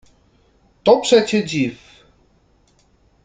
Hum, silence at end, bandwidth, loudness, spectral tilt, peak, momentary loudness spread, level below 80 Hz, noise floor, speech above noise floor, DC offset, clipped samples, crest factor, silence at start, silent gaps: none; 1.5 s; 9.4 kHz; -17 LUFS; -4.5 dB/octave; -2 dBFS; 9 LU; -56 dBFS; -57 dBFS; 42 dB; under 0.1%; under 0.1%; 20 dB; 0.85 s; none